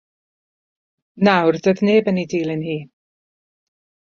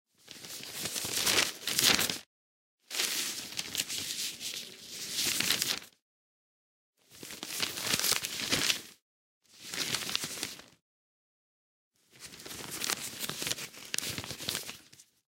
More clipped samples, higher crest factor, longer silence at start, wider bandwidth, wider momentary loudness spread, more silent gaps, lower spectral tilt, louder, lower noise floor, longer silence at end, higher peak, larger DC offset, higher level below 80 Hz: neither; second, 20 dB vs 30 dB; first, 1.15 s vs 0.25 s; second, 7 kHz vs 17 kHz; second, 10 LU vs 17 LU; second, none vs 2.26-2.78 s, 6.02-6.93 s, 9.02-9.41 s, 10.82-11.91 s; first, -7 dB/octave vs -0.5 dB/octave; first, -18 LUFS vs -31 LUFS; first, under -90 dBFS vs -59 dBFS; first, 1.2 s vs 0.25 s; first, 0 dBFS vs -6 dBFS; neither; about the same, -64 dBFS vs -68 dBFS